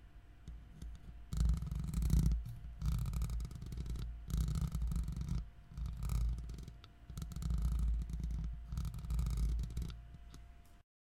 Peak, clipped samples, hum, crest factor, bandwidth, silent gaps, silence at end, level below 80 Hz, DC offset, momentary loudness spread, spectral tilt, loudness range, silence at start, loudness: -20 dBFS; under 0.1%; none; 18 dB; 15.5 kHz; none; 0.3 s; -40 dBFS; under 0.1%; 18 LU; -6.5 dB/octave; 3 LU; 0 s; -41 LUFS